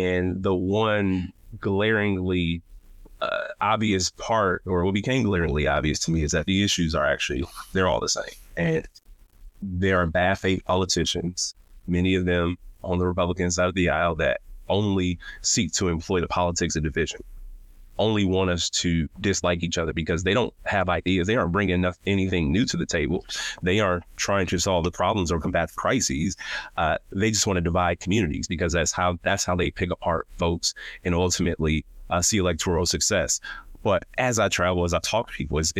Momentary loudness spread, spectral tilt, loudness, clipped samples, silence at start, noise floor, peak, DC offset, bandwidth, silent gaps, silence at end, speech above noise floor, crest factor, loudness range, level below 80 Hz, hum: 6 LU; -4 dB/octave; -24 LUFS; under 0.1%; 0 s; -47 dBFS; -8 dBFS; under 0.1%; 15.5 kHz; none; 0 s; 23 dB; 16 dB; 2 LU; -40 dBFS; none